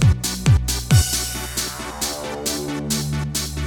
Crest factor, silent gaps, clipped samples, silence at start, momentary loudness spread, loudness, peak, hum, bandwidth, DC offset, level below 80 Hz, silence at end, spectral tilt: 18 dB; none; under 0.1%; 0 s; 8 LU; -21 LUFS; -4 dBFS; none; 19.5 kHz; under 0.1%; -30 dBFS; 0 s; -4 dB/octave